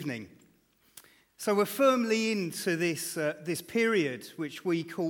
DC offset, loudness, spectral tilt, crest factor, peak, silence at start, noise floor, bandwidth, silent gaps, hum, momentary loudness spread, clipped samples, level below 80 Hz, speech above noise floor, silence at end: under 0.1%; -29 LUFS; -4.5 dB/octave; 16 dB; -14 dBFS; 0 s; -66 dBFS; 19 kHz; none; none; 12 LU; under 0.1%; -78 dBFS; 37 dB; 0 s